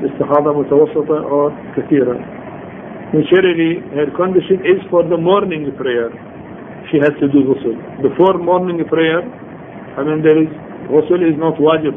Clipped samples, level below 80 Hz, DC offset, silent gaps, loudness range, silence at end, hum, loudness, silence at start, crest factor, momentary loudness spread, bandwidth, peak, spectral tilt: under 0.1%; -52 dBFS; under 0.1%; none; 2 LU; 0 s; none; -14 LUFS; 0 s; 14 dB; 18 LU; 3.7 kHz; 0 dBFS; -10 dB/octave